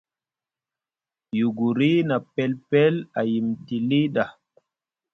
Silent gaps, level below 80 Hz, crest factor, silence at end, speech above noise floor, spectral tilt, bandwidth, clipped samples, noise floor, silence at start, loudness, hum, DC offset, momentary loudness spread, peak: none; -68 dBFS; 18 dB; 0.8 s; over 68 dB; -8.5 dB/octave; 6.2 kHz; under 0.1%; under -90 dBFS; 1.35 s; -23 LUFS; none; under 0.1%; 7 LU; -6 dBFS